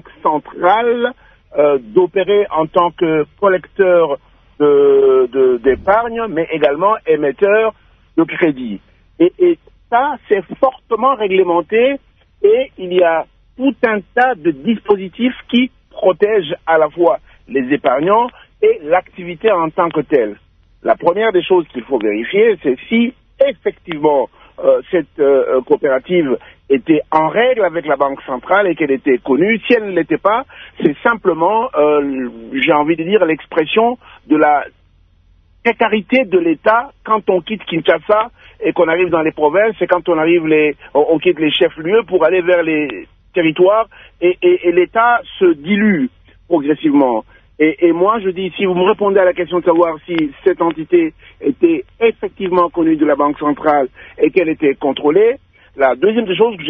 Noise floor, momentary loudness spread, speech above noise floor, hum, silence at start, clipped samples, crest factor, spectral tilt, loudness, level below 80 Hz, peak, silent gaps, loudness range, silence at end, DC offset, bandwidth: -51 dBFS; 7 LU; 37 dB; none; 0.25 s; under 0.1%; 14 dB; -8.5 dB/octave; -14 LUFS; -50 dBFS; 0 dBFS; none; 2 LU; 0 s; under 0.1%; 3.8 kHz